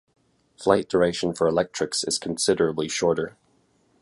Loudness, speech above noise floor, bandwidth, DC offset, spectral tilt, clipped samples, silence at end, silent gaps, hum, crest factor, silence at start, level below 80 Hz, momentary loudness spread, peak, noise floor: -24 LUFS; 41 dB; 11.5 kHz; under 0.1%; -4 dB/octave; under 0.1%; 0.7 s; none; none; 22 dB; 0.6 s; -56 dBFS; 5 LU; -4 dBFS; -64 dBFS